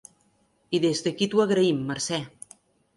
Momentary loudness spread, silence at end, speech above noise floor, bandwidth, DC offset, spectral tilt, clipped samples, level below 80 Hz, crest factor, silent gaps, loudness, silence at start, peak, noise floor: 19 LU; 0.7 s; 42 dB; 11.5 kHz; under 0.1%; -4.5 dB/octave; under 0.1%; -68 dBFS; 16 dB; none; -25 LUFS; 0.7 s; -10 dBFS; -66 dBFS